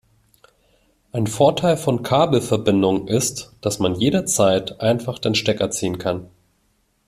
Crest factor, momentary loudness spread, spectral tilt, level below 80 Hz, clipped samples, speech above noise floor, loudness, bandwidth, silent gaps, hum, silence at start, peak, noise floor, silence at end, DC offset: 18 dB; 8 LU; -4.5 dB/octave; -52 dBFS; under 0.1%; 46 dB; -20 LUFS; 15 kHz; none; none; 1.15 s; -2 dBFS; -65 dBFS; 0.85 s; under 0.1%